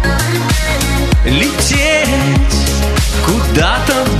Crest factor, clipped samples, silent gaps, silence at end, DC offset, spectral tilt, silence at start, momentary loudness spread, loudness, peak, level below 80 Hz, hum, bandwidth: 12 dB; under 0.1%; none; 0 s; under 0.1%; -4 dB/octave; 0 s; 3 LU; -12 LUFS; 0 dBFS; -16 dBFS; none; 14 kHz